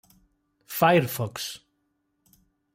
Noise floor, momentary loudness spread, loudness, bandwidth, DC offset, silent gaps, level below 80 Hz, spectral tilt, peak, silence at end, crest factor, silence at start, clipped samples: -74 dBFS; 15 LU; -25 LUFS; 16.5 kHz; under 0.1%; none; -68 dBFS; -5 dB/octave; -8 dBFS; 1.15 s; 20 dB; 0.7 s; under 0.1%